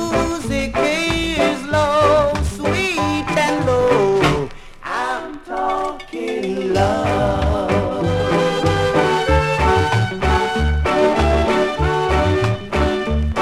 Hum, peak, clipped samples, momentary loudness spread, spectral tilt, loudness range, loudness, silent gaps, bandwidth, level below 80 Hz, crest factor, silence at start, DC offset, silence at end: none; -2 dBFS; under 0.1%; 8 LU; -5.5 dB/octave; 3 LU; -18 LUFS; none; 14 kHz; -28 dBFS; 14 dB; 0 s; under 0.1%; 0 s